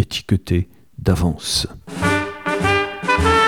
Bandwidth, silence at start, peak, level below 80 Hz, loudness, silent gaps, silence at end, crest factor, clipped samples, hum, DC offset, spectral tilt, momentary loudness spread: 17.5 kHz; 0 s; -2 dBFS; -32 dBFS; -20 LUFS; none; 0 s; 16 dB; under 0.1%; none; 0.3%; -4.5 dB/octave; 6 LU